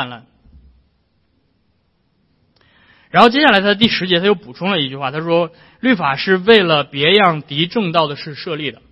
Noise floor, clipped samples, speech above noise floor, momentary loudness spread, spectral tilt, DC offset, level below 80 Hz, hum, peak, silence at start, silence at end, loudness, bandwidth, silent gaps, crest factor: -62 dBFS; under 0.1%; 47 dB; 12 LU; -6.5 dB/octave; under 0.1%; -52 dBFS; none; 0 dBFS; 0 s; 0.2 s; -14 LUFS; 11 kHz; none; 16 dB